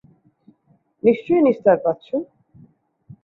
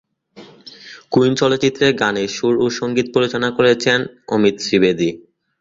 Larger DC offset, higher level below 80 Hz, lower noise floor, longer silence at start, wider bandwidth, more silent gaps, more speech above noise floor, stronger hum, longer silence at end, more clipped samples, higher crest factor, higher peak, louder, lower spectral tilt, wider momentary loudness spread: neither; second, -64 dBFS vs -54 dBFS; first, -61 dBFS vs -43 dBFS; first, 1.05 s vs 0.35 s; second, 4.2 kHz vs 7.8 kHz; neither; first, 43 dB vs 27 dB; neither; first, 1 s vs 0.4 s; neither; about the same, 20 dB vs 16 dB; about the same, -2 dBFS vs 0 dBFS; about the same, -19 LUFS vs -17 LUFS; first, -9.5 dB/octave vs -5 dB/octave; first, 12 LU vs 7 LU